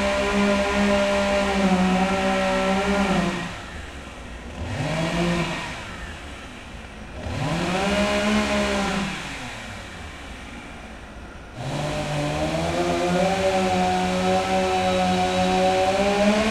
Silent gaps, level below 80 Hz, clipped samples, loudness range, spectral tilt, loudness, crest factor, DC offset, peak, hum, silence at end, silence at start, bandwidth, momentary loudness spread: none; -40 dBFS; under 0.1%; 8 LU; -5 dB/octave; -22 LUFS; 16 dB; under 0.1%; -8 dBFS; none; 0 s; 0 s; 13.5 kHz; 17 LU